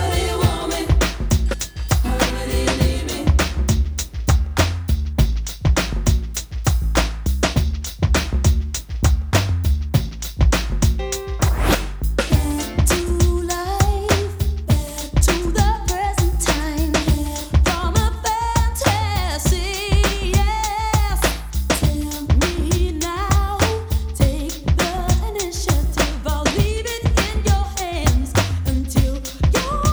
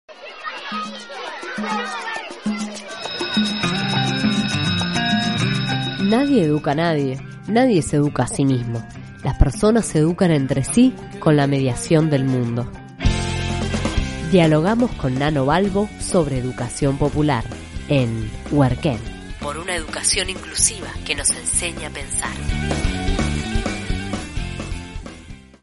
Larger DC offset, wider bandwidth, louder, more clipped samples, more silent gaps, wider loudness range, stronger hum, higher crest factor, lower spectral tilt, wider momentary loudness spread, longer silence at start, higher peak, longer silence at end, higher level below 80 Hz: neither; first, over 20 kHz vs 11.5 kHz; about the same, -20 LUFS vs -20 LUFS; neither; neither; second, 1 LU vs 5 LU; neither; about the same, 18 dB vs 20 dB; about the same, -4.5 dB/octave vs -5 dB/octave; second, 5 LU vs 13 LU; about the same, 0 s vs 0.1 s; about the same, 0 dBFS vs 0 dBFS; second, 0 s vs 0.2 s; first, -22 dBFS vs -32 dBFS